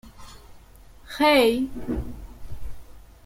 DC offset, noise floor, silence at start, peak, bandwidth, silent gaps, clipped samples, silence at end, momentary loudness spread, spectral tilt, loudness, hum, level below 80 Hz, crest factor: under 0.1%; -48 dBFS; 0.05 s; -8 dBFS; 16.5 kHz; none; under 0.1%; 0.25 s; 26 LU; -4.5 dB/octave; -22 LUFS; none; -42 dBFS; 18 dB